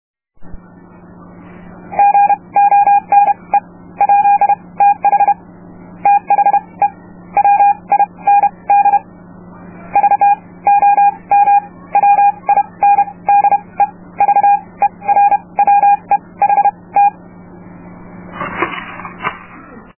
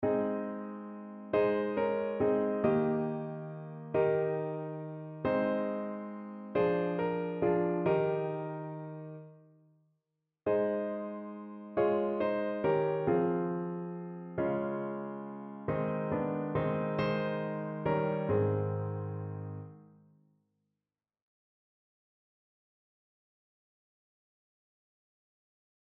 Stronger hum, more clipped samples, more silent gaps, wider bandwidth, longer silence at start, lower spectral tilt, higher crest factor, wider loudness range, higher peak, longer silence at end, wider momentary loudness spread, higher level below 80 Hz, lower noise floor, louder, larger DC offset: neither; neither; neither; second, 3.1 kHz vs 5.8 kHz; first, 0.4 s vs 0 s; about the same, -8 dB/octave vs -7.5 dB/octave; second, 12 dB vs 20 dB; about the same, 3 LU vs 5 LU; first, 0 dBFS vs -14 dBFS; second, 0.2 s vs 6.05 s; second, 9 LU vs 13 LU; first, -50 dBFS vs -66 dBFS; second, -39 dBFS vs under -90 dBFS; first, -12 LUFS vs -33 LUFS; neither